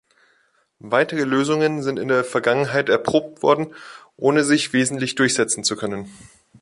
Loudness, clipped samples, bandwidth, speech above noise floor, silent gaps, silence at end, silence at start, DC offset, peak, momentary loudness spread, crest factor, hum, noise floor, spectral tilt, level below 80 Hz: -20 LUFS; under 0.1%; 11.5 kHz; 43 dB; none; 0.45 s; 0.85 s; under 0.1%; -4 dBFS; 8 LU; 18 dB; none; -63 dBFS; -4 dB/octave; -62 dBFS